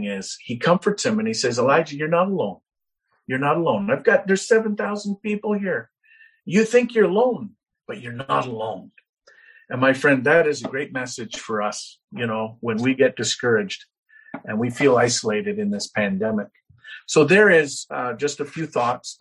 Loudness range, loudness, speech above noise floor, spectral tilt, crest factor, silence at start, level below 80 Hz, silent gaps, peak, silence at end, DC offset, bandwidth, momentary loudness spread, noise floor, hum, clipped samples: 4 LU; -21 LUFS; 50 dB; -4.5 dB/octave; 20 dB; 0 s; -64 dBFS; 9.09-9.13 s, 12.04-12.08 s, 13.98-14.03 s; -2 dBFS; 0.1 s; under 0.1%; 11.5 kHz; 14 LU; -71 dBFS; none; under 0.1%